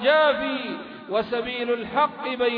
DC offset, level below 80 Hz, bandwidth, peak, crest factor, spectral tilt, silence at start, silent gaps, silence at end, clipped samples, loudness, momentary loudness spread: under 0.1%; -60 dBFS; 5.2 kHz; -8 dBFS; 16 dB; -6.5 dB/octave; 0 s; none; 0 s; under 0.1%; -24 LUFS; 10 LU